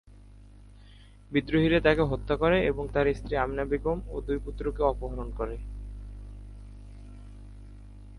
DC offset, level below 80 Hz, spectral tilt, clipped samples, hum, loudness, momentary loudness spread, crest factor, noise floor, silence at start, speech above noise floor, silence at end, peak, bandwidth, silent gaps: under 0.1%; -40 dBFS; -8 dB/octave; under 0.1%; 50 Hz at -40 dBFS; -28 LUFS; 24 LU; 22 dB; -51 dBFS; 0.05 s; 24 dB; 0 s; -8 dBFS; 11 kHz; none